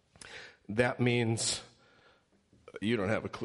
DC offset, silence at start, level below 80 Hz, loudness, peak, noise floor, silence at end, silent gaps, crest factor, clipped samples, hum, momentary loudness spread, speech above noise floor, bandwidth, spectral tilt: under 0.1%; 0.25 s; -64 dBFS; -31 LUFS; -12 dBFS; -67 dBFS; 0 s; none; 22 dB; under 0.1%; none; 19 LU; 36 dB; 11.5 kHz; -4.5 dB/octave